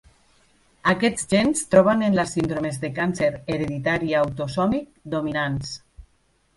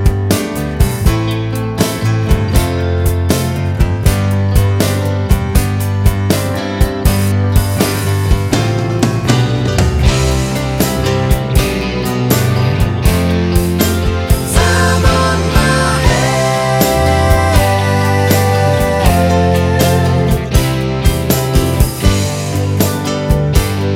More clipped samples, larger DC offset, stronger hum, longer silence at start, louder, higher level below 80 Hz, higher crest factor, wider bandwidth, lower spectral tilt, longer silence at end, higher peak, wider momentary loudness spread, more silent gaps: neither; neither; neither; first, 0.85 s vs 0 s; second, -22 LUFS vs -13 LUFS; second, -50 dBFS vs -20 dBFS; first, 20 dB vs 12 dB; second, 11.5 kHz vs 17 kHz; about the same, -5 dB/octave vs -5.5 dB/octave; first, 0.55 s vs 0 s; about the same, -2 dBFS vs 0 dBFS; first, 10 LU vs 4 LU; neither